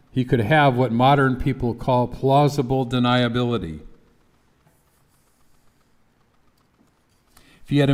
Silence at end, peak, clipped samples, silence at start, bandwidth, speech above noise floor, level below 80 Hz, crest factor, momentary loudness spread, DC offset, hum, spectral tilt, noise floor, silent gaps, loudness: 0 s; -4 dBFS; under 0.1%; 0.15 s; 14 kHz; 42 dB; -44 dBFS; 18 dB; 8 LU; under 0.1%; none; -7.5 dB/octave; -61 dBFS; none; -20 LUFS